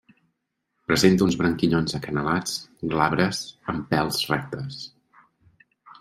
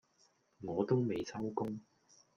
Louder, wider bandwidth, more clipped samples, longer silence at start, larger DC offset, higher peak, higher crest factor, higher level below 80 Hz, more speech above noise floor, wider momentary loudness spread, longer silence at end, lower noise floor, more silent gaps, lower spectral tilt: first, -24 LUFS vs -37 LUFS; first, 16 kHz vs 7.2 kHz; neither; first, 0.9 s vs 0.6 s; neither; first, -2 dBFS vs -18 dBFS; about the same, 22 dB vs 20 dB; first, -52 dBFS vs -72 dBFS; first, 54 dB vs 36 dB; about the same, 14 LU vs 13 LU; second, 0.1 s vs 0.55 s; first, -77 dBFS vs -73 dBFS; neither; second, -5 dB/octave vs -7.5 dB/octave